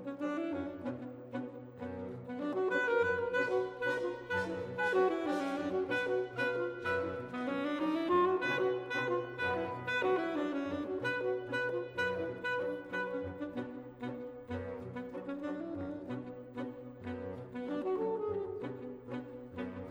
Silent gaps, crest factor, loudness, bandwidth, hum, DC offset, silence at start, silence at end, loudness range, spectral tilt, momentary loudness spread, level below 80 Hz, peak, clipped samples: none; 16 dB; -36 LUFS; 11.5 kHz; none; under 0.1%; 0 s; 0 s; 8 LU; -6.5 dB/octave; 12 LU; -68 dBFS; -20 dBFS; under 0.1%